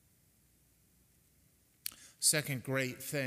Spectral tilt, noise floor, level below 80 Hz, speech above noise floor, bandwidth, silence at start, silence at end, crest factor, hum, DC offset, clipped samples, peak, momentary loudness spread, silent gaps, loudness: -2.5 dB/octave; -69 dBFS; -76 dBFS; 35 dB; 16 kHz; 1.85 s; 0 s; 26 dB; none; under 0.1%; under 0.1%; -12 dBFS; 16 LU; none; -34 LUFS